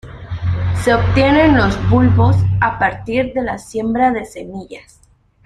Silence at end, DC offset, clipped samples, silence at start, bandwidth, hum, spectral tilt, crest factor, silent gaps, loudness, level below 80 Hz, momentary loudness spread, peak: 0.65 s; under 0.1%; under 0.1%; 0.05 s; 11.5 kHz; none; -7.5 dB/octave; 14 dB; none; -15 LUFS; -32 dBFS; 18 LU; -2 dBFS